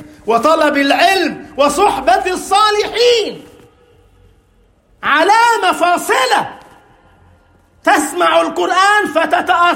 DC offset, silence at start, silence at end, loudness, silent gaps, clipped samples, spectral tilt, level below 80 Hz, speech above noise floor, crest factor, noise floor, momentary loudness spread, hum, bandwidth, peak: under 0.1%; 0 s; 0 s; -12 LUFS; none; under 0.1%; -2 dB/octave; -50 dBFS; 40 dB; 14 dB; -52 dBFS; 5 LU; none; 16.5 kHz; 0 dBFS